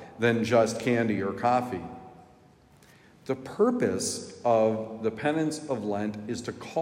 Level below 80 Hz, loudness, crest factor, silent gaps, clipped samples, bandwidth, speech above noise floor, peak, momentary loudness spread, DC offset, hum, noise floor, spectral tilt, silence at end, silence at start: -68 dBFS; -28 LUFS; 18 dB; none; under 0.1%; 16 kHz; 30 dB; -10 dBFS; 11 LU; under 0.1%; none; -57 dBFS; -5 dB/octave; 0 s; 0 s